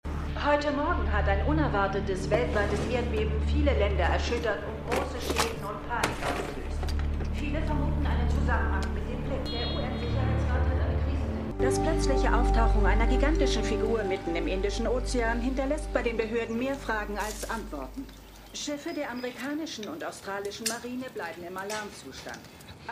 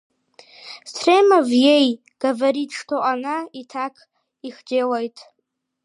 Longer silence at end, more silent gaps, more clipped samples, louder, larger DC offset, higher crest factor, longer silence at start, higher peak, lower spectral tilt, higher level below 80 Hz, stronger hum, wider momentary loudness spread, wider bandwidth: second, 0 s vs 0.6 s; neither; neither; second, -29 LUFS vs -19 LUFS; neither; about the same, 18 dB vs 18 dB; second, 0.05 s vs 0.6 s; second, -10 dBFS vs -4 dBFS; first, -5.5 dB/octave vs -3 dB/octave; first, -32 dBFS vs -78 dBFS; neither; second, 11 LU vs 21 LU; first, 15.5 kHz vs 11.5 kHz